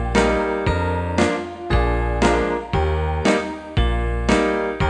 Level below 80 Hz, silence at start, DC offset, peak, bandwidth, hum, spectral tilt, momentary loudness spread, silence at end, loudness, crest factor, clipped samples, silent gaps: -26 dBFS; 0 s; under 0.1%; 0 dBFS; 10.5 kHz; none; -6 dB/octave; 4 LU; 0 s; -20 LUFS; 18 dB; under 0.1%; none